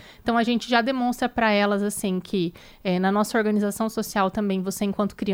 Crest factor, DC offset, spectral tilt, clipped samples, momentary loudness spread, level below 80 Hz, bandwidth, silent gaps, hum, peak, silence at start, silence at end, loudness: 16 dB; under 0.1%; -5 dB/octave; under 0.1%; 6 LU; -54 dBFS; 16.5 kHz; none; none; -6 dBFS; 0 s; 0 s; -24 LUFS